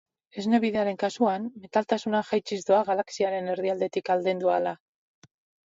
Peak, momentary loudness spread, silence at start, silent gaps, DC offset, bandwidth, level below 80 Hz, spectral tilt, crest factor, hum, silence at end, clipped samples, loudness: -10 dBFS; 6 LU; 0.35 s; none; under 0.1%; 8 kHz; -72 dBFS; -5.5 dB/octave; 18 dB; none; 0.9 s; under 0.1%; -27 LUFS